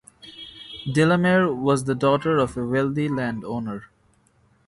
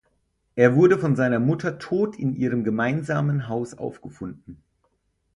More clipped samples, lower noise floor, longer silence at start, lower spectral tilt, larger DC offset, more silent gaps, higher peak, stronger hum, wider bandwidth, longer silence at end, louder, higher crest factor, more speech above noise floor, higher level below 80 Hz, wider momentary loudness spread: neither; second, -61 dBFS vs -70 dBFS; second, 0.25 s vs 0.55 s; second, -6.5 dB/octave vs -8.5 dB/octave; neither; neither; second, -6 dBFS vs -2 dBFS; neither; about the same, 11.5 kHz vs 11 kHz; about the same, 0.8 s vs 0.8 s; about the same, -22 LUFS vs -22 LUFS; about the same, 18 dB vs 22 dB; second, 40 dB vs 48 dB; about the same, -54 dBFS vs -58 dBFS; about the same, 19 LU vs 17 LU